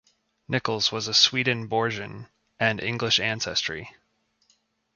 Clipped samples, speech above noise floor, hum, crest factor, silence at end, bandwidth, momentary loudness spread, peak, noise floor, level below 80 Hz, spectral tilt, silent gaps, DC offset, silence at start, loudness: under 0.1%; 43 dB; none; 24 dB; 1.05 s; 7.4 kHz; 14 LU; -4 dBFS; -69 dBFS; -60 dBFS; -3 dB/octave; none; under 0.1%; 0.5 s; -24 LUFS